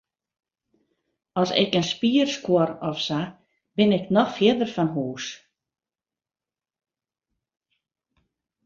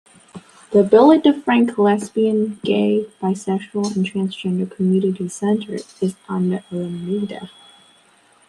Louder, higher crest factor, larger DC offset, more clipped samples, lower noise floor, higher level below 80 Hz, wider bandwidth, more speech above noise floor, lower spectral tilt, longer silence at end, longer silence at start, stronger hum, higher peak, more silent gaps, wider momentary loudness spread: second, -23 LUFS vs -19 LUFS; first, 22 dB vs 16 dB; neither; neither; first, under -90 dBFS vs -54 dBFS; about the same, -66 dBFS vs -64 dBFS; second, 7.6 kHz vs 11.5 kHz; first, over 68 dB vs 36 dB; second, -5.5 dB/octave vs -7 dB/octave; first, 3.3 s vs 1 s; first, 1.35 s vs 0.35 s; neither; about the same, -4 dBFS vs -2 dBFS; neither; about the same, 11 LU vs 12 LU